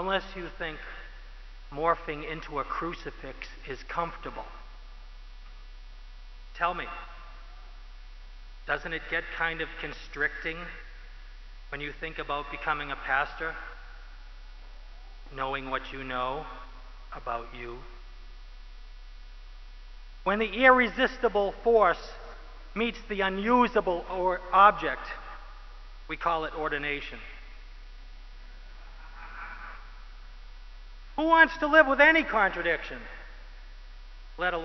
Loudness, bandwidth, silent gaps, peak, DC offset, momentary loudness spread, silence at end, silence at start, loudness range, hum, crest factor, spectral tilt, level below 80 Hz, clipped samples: -27 LUFS; 6.2 kHz; none; -4 dBFS; under 0.1%; 27 LU; 0 s; 0 s; 16 LU; none; 26 dB; -5.5 dB/octave; -44 dBFS; under 0.1%